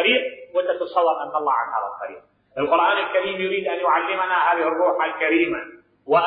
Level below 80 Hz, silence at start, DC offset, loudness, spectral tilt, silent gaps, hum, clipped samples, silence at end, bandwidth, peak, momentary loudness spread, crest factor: -66 dBFS; 0 s; under 0.1%; -21 LUFS; -8.5 dB/octave; none; 50 Hz at -65 dBFS; under 0.1%; 0 s; 4.9 kHz; -4 dBFS; 10 LU; 16 dB